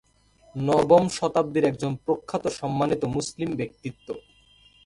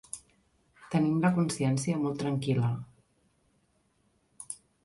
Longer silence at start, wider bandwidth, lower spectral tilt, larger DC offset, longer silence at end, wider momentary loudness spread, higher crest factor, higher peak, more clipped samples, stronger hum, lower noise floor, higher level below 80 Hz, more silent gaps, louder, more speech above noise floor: first, 0.55 s vs 0.15 s; about the same, 11.5 kHz vs 11.5 kHz; about the same, -6 dB/octave vs -6.5 dB/octave; neither; first, 0.65 s vs 0.3 s; about the same, 19 LU vs 17 LU; about the same, 22 dB vs 18 dB; first, -4 dBFS vs -14 dBFS; neither; neither; second, -58 dBFS vs -71 dBFS; first, -56 dBFS vs -66 dBFS; neither; first, -25 LUFS vs -29 LUFS; second, 34 dB vs 43 dB